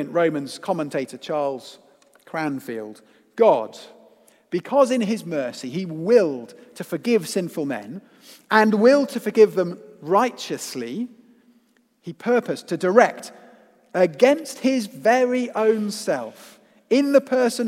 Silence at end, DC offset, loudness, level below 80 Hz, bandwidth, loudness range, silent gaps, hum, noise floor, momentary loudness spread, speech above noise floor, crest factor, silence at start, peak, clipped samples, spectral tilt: 0 s; under 0.1%; -21 LUFS; -80 dBFS; 16 kHz; 5 LU; none; none; -61 dBFS; 17 LU; 40 dB; 22 dB; 0 s; 0 dBFS; under 0.1%; -5 dB/octave